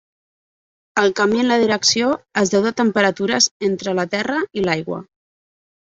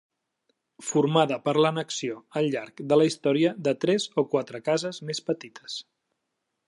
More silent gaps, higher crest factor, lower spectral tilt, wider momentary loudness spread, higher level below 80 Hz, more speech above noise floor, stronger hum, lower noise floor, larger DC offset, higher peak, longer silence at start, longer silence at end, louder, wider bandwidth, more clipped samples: first, 3.51-3.60 s vs none; about the same, 18 dB vs 18 dB; second, -3 dB/octave vs -5 dB/octave; second, 7 LU vs 11 LU; first, -58 dBFS vs -76 dBFS; first, over 72 dB vs 55 dB; neither; first, under -90 dBFS vs -81 dBFS; neither; first, -2 dBFS vs -8 dBFS; first, 0.95 s vs 0.8 s; about the same, 0.85 s vs 0.85 s; first, -18 LUFS vs -26 LUFS; second, 8 kHz vs 11.5 kHz; neither